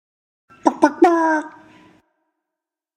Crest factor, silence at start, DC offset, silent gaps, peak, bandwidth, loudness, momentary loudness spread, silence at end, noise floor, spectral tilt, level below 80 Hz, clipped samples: 20 dB; 0.65 s; under 0.1%; none; 0 dBFS; 10 kHz; -17 LUFS; 9 LU; 1.45 s; -85 dBFS; -4 dB/octave; -70 dBFS; under 0.1%